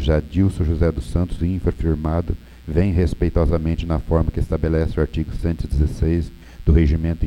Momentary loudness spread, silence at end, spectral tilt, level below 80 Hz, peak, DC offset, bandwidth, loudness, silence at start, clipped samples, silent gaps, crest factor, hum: 6 LU; 0 s; -9 dB/octave; -24 dBFS; -2 dBFS; under 0.1%; 10.5 kHz; -21 LUFS; 0 s; under 0.1%; none; 18 dB; none